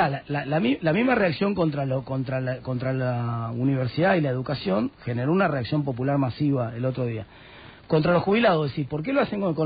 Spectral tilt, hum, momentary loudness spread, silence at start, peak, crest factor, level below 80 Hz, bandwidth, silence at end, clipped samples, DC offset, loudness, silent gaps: -6 dB/octave; none; 8 LU; 0 s; -10 dBFS; 14 dB; -54 dBFS; 4.9 kHz; 0 s; under 0.1%; under 0.1%; -24 LUFS; none